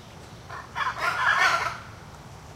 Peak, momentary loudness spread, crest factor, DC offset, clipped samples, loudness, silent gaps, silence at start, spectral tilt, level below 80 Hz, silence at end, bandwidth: -10 dBFS; 24 LU; 18 dB; under 0.1%; under 0.1%; -24 LUFS; none; 0 s; -2 dB/octave; -54 dBFS; 0 s; 16 kHz